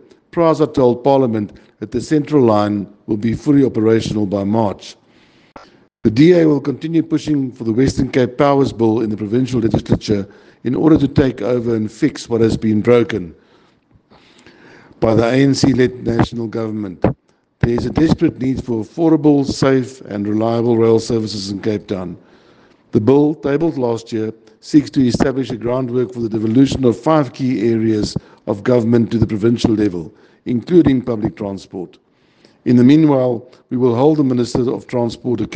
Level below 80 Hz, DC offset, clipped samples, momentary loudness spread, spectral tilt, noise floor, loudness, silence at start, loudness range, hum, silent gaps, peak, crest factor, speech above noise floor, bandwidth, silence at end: -42 dBFS; under 0.1%; under 0.1%; 11 LU; -7.5 dB/octave; -53 dBFS; -16 LUFS; 0.35 s; 3 LU; none; none; 0 dBFS; 16 dB; 38 dB; 9.2 kHz; 0 s